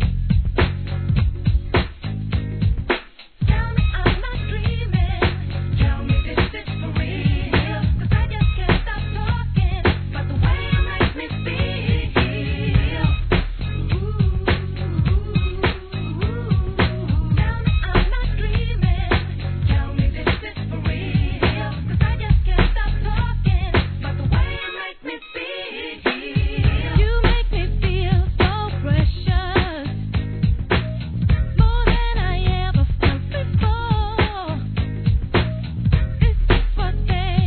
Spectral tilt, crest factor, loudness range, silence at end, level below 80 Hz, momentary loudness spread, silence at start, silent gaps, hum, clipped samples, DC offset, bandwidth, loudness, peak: -10 dB/octave; 18 dB; 2 LU; 0 s; -22 dBFS; 6 LU; 0 s; none; none; under 0.1%; 0.3%; 4.5 kHz; -21 LUFS; -2 dBFS